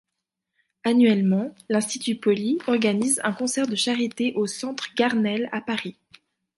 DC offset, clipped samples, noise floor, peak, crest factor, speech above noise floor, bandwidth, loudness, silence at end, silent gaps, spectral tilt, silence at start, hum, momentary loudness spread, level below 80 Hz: under 0.1%; under 0.1%; -83 dBFS; -8 dBFS; 16 dB; 60 dB; 12 kHz; -23 LUFS; 0.65 s; none; -4 dB/octave; 0.85 s; none; 9 LU; -72 dBFS